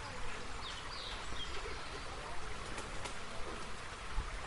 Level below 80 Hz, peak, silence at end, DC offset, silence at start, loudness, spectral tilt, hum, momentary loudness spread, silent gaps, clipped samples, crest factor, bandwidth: -48 dBFS; -24 dBFS; 0 s; under 0.1%; 0 s; -44 LUFS; -3 dB/octave; none; 2 LU; none; under 0.1%; 16 dB; 11.5 kHz